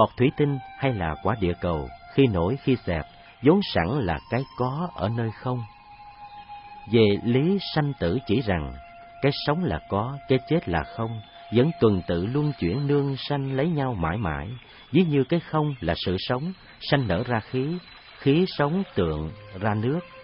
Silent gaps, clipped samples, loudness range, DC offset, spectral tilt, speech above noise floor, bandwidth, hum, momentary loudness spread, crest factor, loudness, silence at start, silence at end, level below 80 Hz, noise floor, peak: none; under 0.1%; 2 LU; under 0.1%; -11.5 dB/octave; 22 dB; 5.6 kHz; none; 13 LU; 20 dB; -25 LUFS; 0 s; 0 s; -48 dBFS; -46 dBFS; -6 dBFS